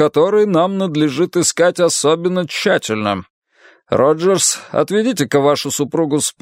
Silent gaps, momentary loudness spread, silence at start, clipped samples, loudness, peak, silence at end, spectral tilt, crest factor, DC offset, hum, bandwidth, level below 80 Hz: 3.30-3.42 s; 5 LU; 0 s; under 0.1%; -15 LUFS; 0 dBFS; 0.1 s; -4 dB/octave; 16 dB; under 0.1%; none; 16 kHz; -60 dBFS